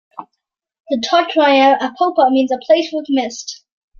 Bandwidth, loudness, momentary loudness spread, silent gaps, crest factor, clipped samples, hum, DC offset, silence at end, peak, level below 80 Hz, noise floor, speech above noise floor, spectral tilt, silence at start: 7.4 kHz; -15 LUFS; 14 LU; 0.80-0.84 s; 14 dB; under 0.1%; none; under 0.1%; 0.45 s; -2 dBFS; -66 dBFS; -75 dBFS; 61 dB; -2.5 dB/octave; 0.2 s